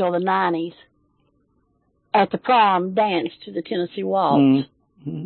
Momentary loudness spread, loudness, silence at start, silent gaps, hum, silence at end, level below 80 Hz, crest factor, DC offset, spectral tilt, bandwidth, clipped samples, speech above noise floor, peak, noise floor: 16 LU; -20 LUFS; 0 s; none; none; 0 s; -68 dBFS; 16 dB; under 0.1%; -11 dB/octave; 4.4 kHz; under 0.1%; 46 dB; -4 dBFS; -66 dBFS